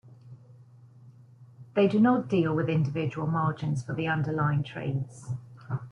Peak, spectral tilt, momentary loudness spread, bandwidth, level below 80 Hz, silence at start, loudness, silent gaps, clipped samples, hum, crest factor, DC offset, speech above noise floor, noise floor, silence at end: -12 dBFS; -8 dB/octave; 14 LU; 10 kHz; -62 dBFS; 0.05 s; -28 LUFS; none; under 0.1%; none; 18 dB; under 0.1%; 26 dB; -53 dBFS; 0 s